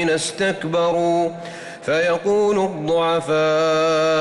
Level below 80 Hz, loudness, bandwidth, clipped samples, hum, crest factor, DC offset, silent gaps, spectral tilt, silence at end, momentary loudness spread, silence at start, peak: -58 dBFS; -19 LUFS; 11.5 kHz; under 0.1%; none; 8 dB; under 0.1%; none; -4.5 dB/octave; 0 s; 6 LU; 0 s; -10 dBFS